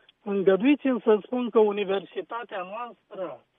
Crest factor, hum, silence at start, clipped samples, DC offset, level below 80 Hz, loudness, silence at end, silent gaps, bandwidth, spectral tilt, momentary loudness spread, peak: 18 dB; none; 0.25 s; under 0.1%; under 0.1%; -78 dBFS; -25 LUFS; 0.2 s; none; 3.8 kHz; -9.5 dB/octave; 15 LU; -8 dBFS